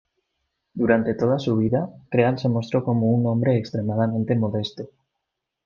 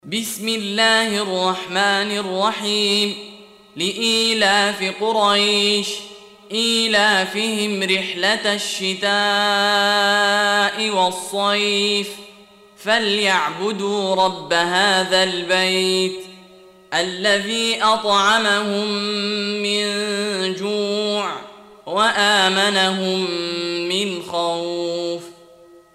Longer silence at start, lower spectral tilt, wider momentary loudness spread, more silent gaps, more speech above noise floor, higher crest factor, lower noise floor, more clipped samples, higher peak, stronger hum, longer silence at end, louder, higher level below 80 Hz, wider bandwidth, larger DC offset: first, 0.75 s vs 0.05 s; first, -8.5 dB/octave vs -2.5 dB/octave; about the same, 7 LU vs 8 LU; neither; first, 60 dB vs 28 dB; about the same, 18 dB vs 16 dB; first, -81 dBFS vs -47 dBFS; neither; about the same, -4 dBFS vs -4 dBFS; neither; first, 0.8 s vs 0.6 s; second, -22 LUFS vs -18 LUFS; first, -60 dBFS vs -66 dBFS; second, 7 kHz vs 16 kHz; neither